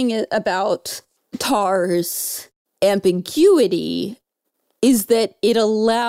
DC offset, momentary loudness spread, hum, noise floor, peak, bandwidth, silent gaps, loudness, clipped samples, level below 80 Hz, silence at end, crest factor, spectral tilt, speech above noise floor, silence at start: under 0.1%; 11 LU; none; -74 dBFS; -4 dBFS; 16 kHz; 2.56-2.65 s; -18 LUFS; under 0.1%; -60 dBFS; 0 s; 14 dB; -4 dB/octave; 57 dB; 0 s